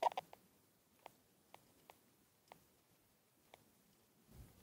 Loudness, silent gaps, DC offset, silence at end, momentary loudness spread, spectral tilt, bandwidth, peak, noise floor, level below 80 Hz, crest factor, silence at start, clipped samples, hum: -51 LUFS; none; under 0.1%; 0.15 s; 13 LU; -3.5 dB/octave; 17 kHz; -24 dBFS; -75 dBFS; -78 dBFS; 28 dB; 0 s; under 0.1%; none